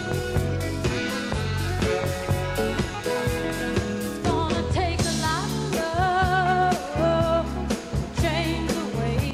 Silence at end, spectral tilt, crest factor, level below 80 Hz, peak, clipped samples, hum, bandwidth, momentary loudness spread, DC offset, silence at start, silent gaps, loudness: 0 s; -5.5 dB/octave; 14 dB; -36 dBFS; -10 dBFS; under 0.1%; none; 16 kHz; 6 LU; under 0.1%; 0 s; none; -25 LUFS